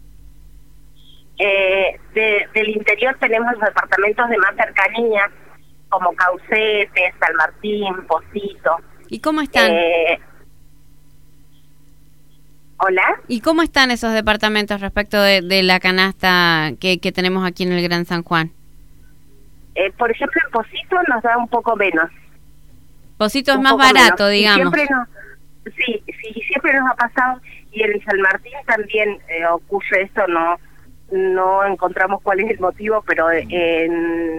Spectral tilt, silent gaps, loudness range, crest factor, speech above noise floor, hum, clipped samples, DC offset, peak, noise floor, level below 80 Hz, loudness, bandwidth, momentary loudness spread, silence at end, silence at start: -4 dB/octave; none; 7 LU; 18 dB; 34 dB; none; under 0.1%; 0.8%; 0 dBFS; -51 dBFS; -46 dBFS; -16 LUFS; 17.5 kHz; 8 LU; 0 s; 1.4 s